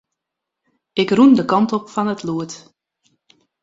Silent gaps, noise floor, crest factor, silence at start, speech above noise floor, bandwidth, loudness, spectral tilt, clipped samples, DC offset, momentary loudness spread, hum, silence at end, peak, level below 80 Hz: none; -82 dBFS; 18 dB; 0.95 s; 66 dB; 7.8 kHz; -17 LUFS; -6 dB/octave; under 0.1%; under 0.1%; 15 LU; none; 1.05 s; -2 dBFS; -60 dBFS